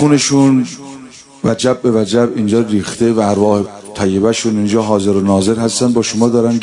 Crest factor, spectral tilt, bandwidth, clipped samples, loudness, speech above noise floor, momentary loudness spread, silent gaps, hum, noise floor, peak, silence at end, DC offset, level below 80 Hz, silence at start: 12 dB; -5.5 dB/octave; 11 kHz; under 0.1%; -13 LUFS; 23 dB; 8 LU; none; none; -35 dBFS; 0 dBFS; 0 s; under 0.1%; -52 dBFS; 0 s